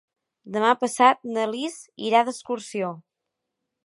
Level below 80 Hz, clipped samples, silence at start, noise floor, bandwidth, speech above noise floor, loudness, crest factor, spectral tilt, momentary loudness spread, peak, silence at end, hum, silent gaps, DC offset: -80 dBFS; under 0.1%; 0.45 s; -83 dBFS; 11.5 kHz; 60 dB; -23 LUFS; 22 dB; -3.5 dB/octave; 13 LU; -2 dBFS; 0.85 s; none; none; under 0.1%